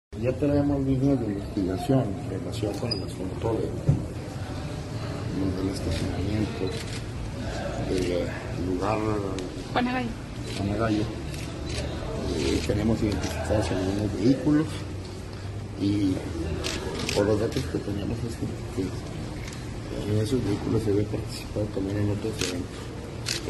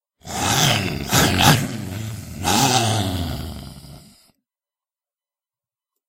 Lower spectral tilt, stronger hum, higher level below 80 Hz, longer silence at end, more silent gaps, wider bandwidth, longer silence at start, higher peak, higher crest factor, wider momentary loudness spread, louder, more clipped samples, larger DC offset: first, -6 dB/octave vs -3.5 dB/octave; neither; about the same, -40 dBFS vs -42 dBFS; second, 0 s vs 2.1 s; neither; second, 12.5 kHz vs 16 kHz; second, 0.1 s vs 0.25 s; second, -8 dBFS vs 0 dBFS; about the same, 18 dB vs 22 dB; second, 10 LU vs 16 LU; second, -28 LUFS vs -18 LUFS; neither; neither